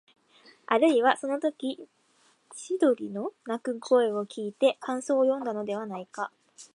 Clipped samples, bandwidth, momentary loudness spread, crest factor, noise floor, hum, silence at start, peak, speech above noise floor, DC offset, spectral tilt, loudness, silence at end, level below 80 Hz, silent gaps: under 0.1%; 11.5 kHz; 13 LU; 22 dB; -65 dBFS; none; 0.7 s; -8 dBFS; 38 dB; under 0.1%; -4.5 dB/octave; -28 LUFS; 0.1 s; -82 dBFS; none